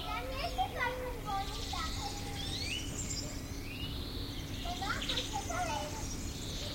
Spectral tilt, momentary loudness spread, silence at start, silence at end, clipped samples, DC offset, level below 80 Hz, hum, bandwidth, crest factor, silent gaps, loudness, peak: -3.5 dB/octave; 6 LU; 0 s; 0 s; under 0.1%; under 0.1%; -44 dBFS; none; 16.5 kHz; 16 dB; none; -38 LUFS; -22 dBFS